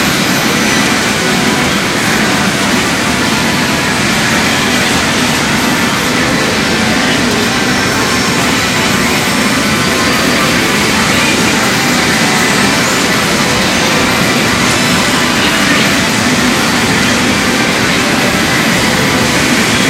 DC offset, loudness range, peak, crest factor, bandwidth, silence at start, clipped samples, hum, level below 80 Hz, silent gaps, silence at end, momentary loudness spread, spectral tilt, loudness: under 0.1%; 1 LU; 0 dBFS; 10 dB; 16.5 kHz; 0 s; under 0.1%; none; -34 dBFS; none; 0 s; 2 LU; -3 dB/octave; -10 LUFS